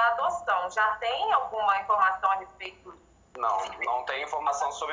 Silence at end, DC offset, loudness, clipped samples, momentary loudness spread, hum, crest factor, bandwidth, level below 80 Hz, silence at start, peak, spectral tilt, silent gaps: 0 s; under 0.1%; -27 LUFS; under 0.1%; 7 LU; none; 16 dB; 7.6 kHz; -64 dBFS; 0 s; -12 dBFS; -1 dB/octave; none